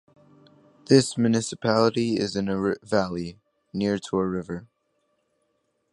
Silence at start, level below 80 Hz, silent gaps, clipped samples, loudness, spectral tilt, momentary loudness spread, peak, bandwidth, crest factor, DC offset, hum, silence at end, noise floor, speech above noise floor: 0.9 s; -58 dBFS; none; under 0.1%; -24 LUFS; -5.5 dB/octave; 14 LU; -4 dBFS; 11.5 kHz; 22 dB; under 0.1%; none; 1.3 s; -73 dBFS; 49 dB